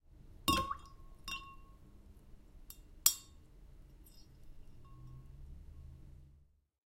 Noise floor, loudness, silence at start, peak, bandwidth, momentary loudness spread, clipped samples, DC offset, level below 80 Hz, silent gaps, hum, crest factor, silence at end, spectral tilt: -66 dBFS; -36 LUFS; 0.05 s; -8 dBFS; 16 kHz; 29 LU; under 0.1%; under 0.1%; -56 dBFS; none; none; 36 dB; 0.55 s; -1.5 dB/octave